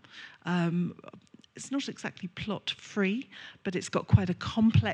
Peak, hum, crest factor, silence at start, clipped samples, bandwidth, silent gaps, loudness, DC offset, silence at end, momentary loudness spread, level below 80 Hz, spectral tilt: -8 dBFS; none; 22 dB; 0.15 s; under 0.1%; 10 kHz; none; -31 LUFS; under 0.1%; 0 s; 14 LU; -54 dBFS; -6 dB/octave